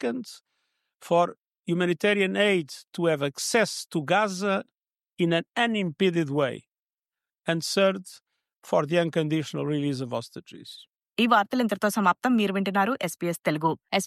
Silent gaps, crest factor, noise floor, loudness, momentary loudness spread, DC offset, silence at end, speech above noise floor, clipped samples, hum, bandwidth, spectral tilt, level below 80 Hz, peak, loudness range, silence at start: 1.41-1.45 s, 1.59-1.63 s, 6.79-6.83 s; 18 dB; under -90 dBFS; -25 LUFS; 14 LU; under 0.1%; 0 s; over 65 dB; under 0.1%; none; 15.5 kHz; -5 dB/octave; -76 dBFS; -8 dBFS; 3 LU; 0 s